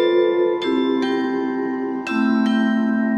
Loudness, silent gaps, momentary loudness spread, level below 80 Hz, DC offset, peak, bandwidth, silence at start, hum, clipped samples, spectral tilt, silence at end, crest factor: -20 LUFS; none; 6 LU; -66 dBFS; under 0.1%; -6 dBFS; 8.6 kHz; 0 s; none; under 0.1%; -6.5 dB/octave; 0 s; 12 dB